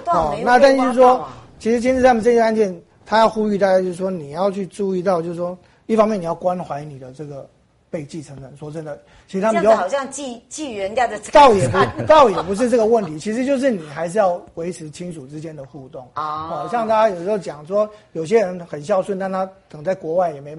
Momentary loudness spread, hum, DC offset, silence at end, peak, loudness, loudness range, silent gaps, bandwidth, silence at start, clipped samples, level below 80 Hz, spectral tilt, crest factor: 20 LU; none; under 0.1%; 0 s; -2 dBFS; -18 LUFS; 9 LU; none; 11.5 kHz; 0 s; under 0.1%; -48 dBFS; -5.5 dB/octave; 18 dB